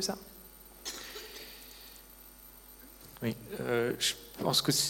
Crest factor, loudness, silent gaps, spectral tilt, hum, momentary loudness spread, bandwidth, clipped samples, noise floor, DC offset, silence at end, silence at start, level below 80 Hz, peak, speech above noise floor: 22 dB; -34 LUFS; none; -3 dB/octave; none; 22 LU; 17 kHz; under 0.1%; -54 dBFS; under 0.1%; 0 s; 0 s; -60 dBFS; -14 dBFS; 21 dB